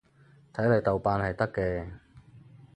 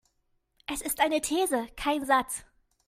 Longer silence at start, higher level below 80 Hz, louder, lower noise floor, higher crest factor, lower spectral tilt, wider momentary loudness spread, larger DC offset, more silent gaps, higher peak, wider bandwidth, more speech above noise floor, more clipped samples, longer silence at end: second, 0.55 s vs 0.7 s; first, -50 dBFS vs -56 dBFS; about the same, -28 LUFS vs -28 LUFS; second, -59 dBFS vs -74 dBFS; about the same, 20 dB vs 20 dB; first, -9 dB/octave vs -1.5 dB/octave; about the same, 13 LU vs 11 LU; neither; neither; about the same, -10 dBFS vs -10 dBFS; second, 9.2 kHz vs 16 kHz; second, 31 dB vs 46 dB; neither; about the same, 0.35 s vs 0.45 s